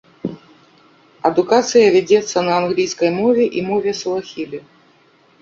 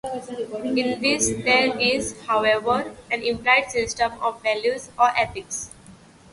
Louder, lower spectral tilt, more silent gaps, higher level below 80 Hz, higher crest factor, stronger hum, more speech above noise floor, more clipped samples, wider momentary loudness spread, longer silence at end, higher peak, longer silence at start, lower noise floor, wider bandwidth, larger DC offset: first, -16 LUFS vs -22 LUFS; first, -4.5 dB/octave vs -2.5 dB/octave; neither; second, -60 dBFS vs -52 dBFS; about the same, 16 dB vs 20 dB; neither; first, 37 dB vs 25 dB; neither; first, 17 LU vs 12 LU; first, 0.8 s vs 0.4 s; about the same, -2 dBFS vs -4 dBFS; first, 0.25 s vs 0.05 s; first, -53 dBFS vs -48 dBFS; second, 7.8 kHz vs 11.5 kHz; neither